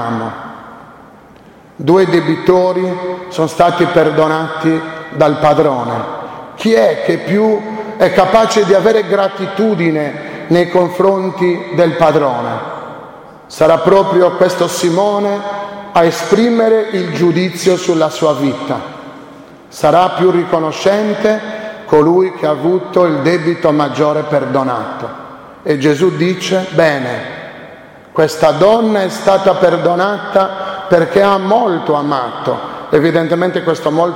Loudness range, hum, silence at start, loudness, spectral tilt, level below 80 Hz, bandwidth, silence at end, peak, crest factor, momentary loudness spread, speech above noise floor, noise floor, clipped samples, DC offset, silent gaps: 3 LU; none; 0 s; -13 LUFS; -6 dB/octave; -50 dBFS; 16.5 kHz; 0 s; 0 dBFS; 12 dB; 13 LU; 28 dB; -40 dBFS; under 0.1%; under 0.1%; none